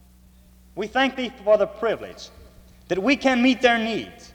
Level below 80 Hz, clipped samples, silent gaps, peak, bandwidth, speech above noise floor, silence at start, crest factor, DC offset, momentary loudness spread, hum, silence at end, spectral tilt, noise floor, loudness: -52 dBFS; under 0.1%; none; -4 dBFS; 12 kHz; 30 dB; 0.75 s; 18 dB; under 0.1%; 19 LU; none; 0.05 s; -4.5 dB/octave; -52 dBFS; -22 LUFS